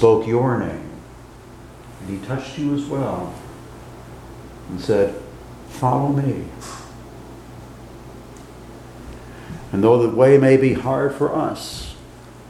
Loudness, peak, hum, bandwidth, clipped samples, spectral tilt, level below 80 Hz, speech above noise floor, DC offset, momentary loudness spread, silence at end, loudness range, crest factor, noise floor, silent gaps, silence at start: -19 LUFS; 0 dBFS; none; 14.5 kHz; under 0.1%; -7.5 dB/octave; -46 dBFS; 23 dB; under 0.1%; 24 LU; 0 s; 11 LU; 22 dB; -41 dBFS; none; 0 s